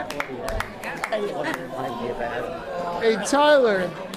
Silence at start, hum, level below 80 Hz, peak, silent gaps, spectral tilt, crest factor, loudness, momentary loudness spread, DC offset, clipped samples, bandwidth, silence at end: 0 s; none; -44 dBFS; -8 dBFS; none; -4 dB/octave; 16 dB; -24 LUFS; 13 LU; under 0.1%; under 0.1%; 15.5 kHz; 0 s